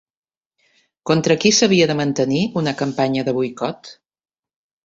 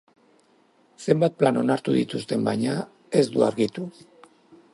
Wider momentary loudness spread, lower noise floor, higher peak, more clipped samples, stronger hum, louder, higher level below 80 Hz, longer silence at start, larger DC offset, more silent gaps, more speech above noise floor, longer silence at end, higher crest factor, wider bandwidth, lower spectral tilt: first, 13 LU vs 10 LU; first, -66 dBFS vs -61 dBFS; about the same, -2 dBFS vs -4 dBFS; neither; neither; first, -18 LUFS vs -24 LUFS; first, -58 dBFS vs -68 dBFS; about the same, 1.05 s vs 1 s; neither; neither; first, 49 dB vs 38 dB; about the same, 0.9 s vs 0.85 s; about the same, 18 dB vs 20 dB; second, 8 kHz vs 11.5 kHz; second, -4.5 dB/octave vs -6.5 dB/octave